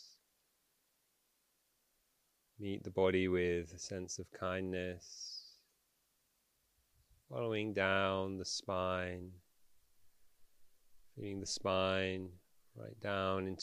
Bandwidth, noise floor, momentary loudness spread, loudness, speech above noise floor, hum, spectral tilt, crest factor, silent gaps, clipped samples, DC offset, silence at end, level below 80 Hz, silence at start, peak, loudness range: 15.5 kHz; -79 dBFS; 15 LU; -38 LUFS; 41 dB; none; -4.5 dB/octave; 24 dB; none; under 0.1%; under 0.1%; 0 s; -70 dBFS; 0 s; -18 dBFS; 6 LU